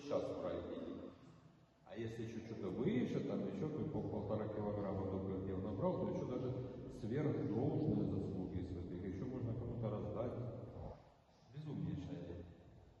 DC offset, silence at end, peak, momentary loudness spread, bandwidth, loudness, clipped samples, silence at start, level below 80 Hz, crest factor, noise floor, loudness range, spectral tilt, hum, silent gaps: under 0.1%; 0 s; -26 dBFS; 13 LU; 8 kHz; -43 LUFS; under 0.1%; 0 s; -64 dBFS; 16 dB; -67 dBFS; 5 LU; -9 dB/octave; none; none